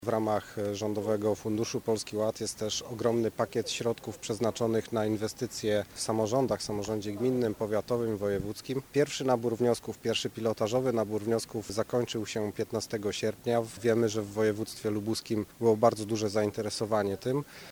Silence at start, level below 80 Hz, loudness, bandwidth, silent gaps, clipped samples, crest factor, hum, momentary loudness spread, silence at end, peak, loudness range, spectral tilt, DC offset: 0 s; -62 dBFS; -31 LUFS; over 20 kHz; none; under 0.1%; 22 dB; none; 5 LU; 0 s; -10 dBFS; 2 LU; -5 dB/octave; under 0.1%